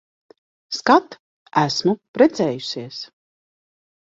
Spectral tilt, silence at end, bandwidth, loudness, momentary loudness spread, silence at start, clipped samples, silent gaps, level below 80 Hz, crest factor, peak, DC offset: -5 dB/octave; 1.1 s; 7.8 kHz; -20 LUFS; 15 LU; 0.7 s; under 0.1%; 1.19-1.46 s, 2.08-2.14 s; -64 dBFS; 20 dB; -2 dBFS; under 0.1%